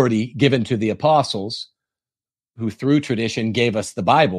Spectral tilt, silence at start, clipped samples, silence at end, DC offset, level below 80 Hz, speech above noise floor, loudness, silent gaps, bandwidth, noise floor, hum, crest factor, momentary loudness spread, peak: -6 dB/octave; 0 s; under 0.1%; 0 s; under 0.1%; -58 dBFS; over 71 dB; -20 LUFS; none; 12.5 kHz; under -90 dBFS; none; 18 dB; 12 LU; -2 dBFS